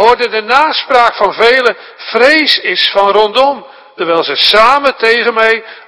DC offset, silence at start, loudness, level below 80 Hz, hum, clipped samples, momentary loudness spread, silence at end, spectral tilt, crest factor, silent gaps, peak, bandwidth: under 0.1%; 0 s; -9 LUFS; -46 dBFS; none; 2%; 7 LU; 0.1 s; -2.5 dB/octave; 10 dB; none; 0 dBFS; 11 kHz